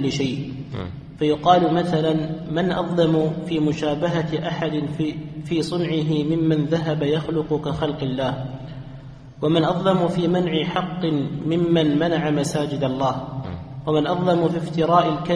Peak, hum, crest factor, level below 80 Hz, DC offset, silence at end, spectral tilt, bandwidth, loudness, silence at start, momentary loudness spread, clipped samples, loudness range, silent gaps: -2 dBFS; none; 20 dB; -48 dBFS; under 0.1%; 0 s; -7 dB/octave; 11 kHz; -22 LUFS; 0 s; 12 LU; under 0.1%; 3 LU; none